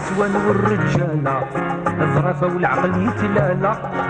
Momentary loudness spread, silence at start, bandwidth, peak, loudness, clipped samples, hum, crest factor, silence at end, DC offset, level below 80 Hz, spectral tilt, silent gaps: 4 LU; 0 s; 9.2 kHz; -4 dBFS; -19 LUFS; under 0.1%; none; 14 dB; 0 s; under 0.1%; -44 dBFS; -8 dB/octave; none